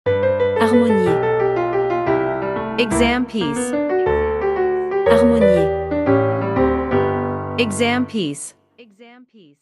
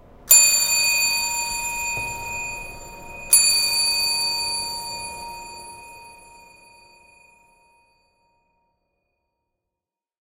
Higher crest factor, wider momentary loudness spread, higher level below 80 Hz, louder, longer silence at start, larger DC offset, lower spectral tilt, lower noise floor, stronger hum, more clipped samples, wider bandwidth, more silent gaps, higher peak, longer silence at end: second, 18 dB vs 24 dB; second, 8 LU vs 24 LU; first, -38 dBFS vs -50 dBFS; about the same, -18 LUFS vs -18 LUFS; second, 0.05 s vs 0.25 s; neither; first, -5.5 dB/octave vs 2 dB/octave; second, -47 dBFS vs -88 dBFS; neither; neither; second, 12 kHz vs 16 kHz; neither; about the same, 0 dBFS vs -2 dBFS; second, 0.55 s vs 4.25 s